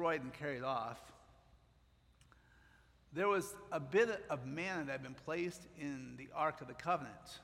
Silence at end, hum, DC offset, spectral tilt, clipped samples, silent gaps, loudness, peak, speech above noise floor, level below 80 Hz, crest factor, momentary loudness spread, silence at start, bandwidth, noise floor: 0 s; none; under 0.1%; -5 dB/octave; under 0.1%; none; -40 LUFS; -20 dBFS; 30 dB; -70 dBFS; 20 dB; 12 LU; 0 s; 16 kHz; -70 dBFS